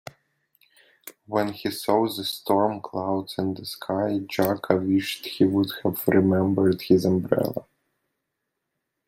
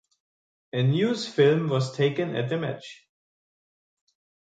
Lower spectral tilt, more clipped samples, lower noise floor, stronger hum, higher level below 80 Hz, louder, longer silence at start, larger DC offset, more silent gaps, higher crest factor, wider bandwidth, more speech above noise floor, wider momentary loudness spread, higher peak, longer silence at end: about the same, -6.5 dB/octave vs -6.5 dB/octave; neither; second, -81 dBFS vs under -90 dBFS; neither; first, -64 dBFS vs -70 dBFS; about the same, -24 LUFS vs -25 LUFS; first, 1.05 s vs 0.75 s; neither; neither; about the same, 22 dB vs 18 dB; first, 16.5 kHz vs 9.2 kHz; second, 57 dB vs over 66 dB; second, 9 LU vs 12 LU; first, -4 dBFS vs -8 dBFS; about the same, 1.45 s vs 1.55 s